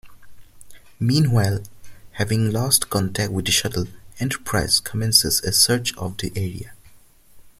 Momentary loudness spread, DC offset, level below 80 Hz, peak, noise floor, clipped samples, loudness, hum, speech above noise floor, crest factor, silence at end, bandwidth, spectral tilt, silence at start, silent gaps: 13 LU; under 0.1%; -46 dBFS; 0 dBFS; -49 dBFS; under 0.1%; -20 LUFS; none; 28 dB; 22 dB; 0.1 s; 16 kHz; -3.5 dB/octave; 0.05 s; none